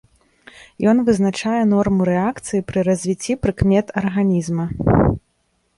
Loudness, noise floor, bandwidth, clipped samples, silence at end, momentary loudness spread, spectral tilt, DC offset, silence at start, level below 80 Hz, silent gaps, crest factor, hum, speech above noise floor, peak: -18 LUFS; -66 dBFS; 11.5 kHz; under 0.1%; 0.6 s; 6 LU; -7 dB/octave; under 0.1%; 0.6 s; -36 dBFS; none; 16 dB; none; 48 dB; -2 dBFS